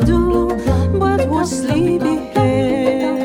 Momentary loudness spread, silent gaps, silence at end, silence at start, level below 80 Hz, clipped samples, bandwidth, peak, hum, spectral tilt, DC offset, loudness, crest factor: 3 LU; none; 0 s; 0 s; -28 dBFS; under 0.1%; 16 kHz; -2 dBFS; none; -7 dB/octave; under 0.1%; -16 LUFS; 12 dB